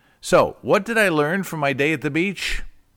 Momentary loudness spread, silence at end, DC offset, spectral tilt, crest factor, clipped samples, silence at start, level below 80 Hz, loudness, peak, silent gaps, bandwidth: 7 LU; 0.25 s; under 0.1%; -5 dB/octave; 16 dB; under 0.1%; 0.25 s; -40 dBFS; -20 LUFS; -6 dBFS; none; 19 kHz